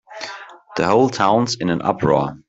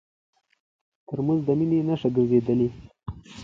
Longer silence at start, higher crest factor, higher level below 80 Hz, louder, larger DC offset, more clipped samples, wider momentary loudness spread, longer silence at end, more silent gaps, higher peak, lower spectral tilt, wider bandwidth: second, 0.1 s vs 1.1 s; about the same, 16 dB vs 16 dB; about the same, -52 dBFS vs -52 dBFS; first, -18 LUFS vs -24 LUFS; neither; neither; second, 16 LU vs 19 LU; about the same, 0.1 s vs 0 s; neither; first, -2 dBFS vs -8 dBFS; second, -5.5 dB/octave vs -9.5 dB/octave; about the same, 8 kHz vs 7.6 kHz